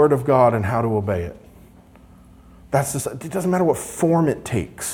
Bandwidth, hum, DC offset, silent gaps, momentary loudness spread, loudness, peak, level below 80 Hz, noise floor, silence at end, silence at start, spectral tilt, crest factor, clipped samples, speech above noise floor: 18.5 kHz; 60 Hz at -45 dBFS; under 0.1%; none; 10 LU; -20 LUFS; -4 dBFS; -50 dBFS; -47 dBFS; 0 s; 0 s; -6.5 dB/octave; 18 dB; under 0.1%; 28 dB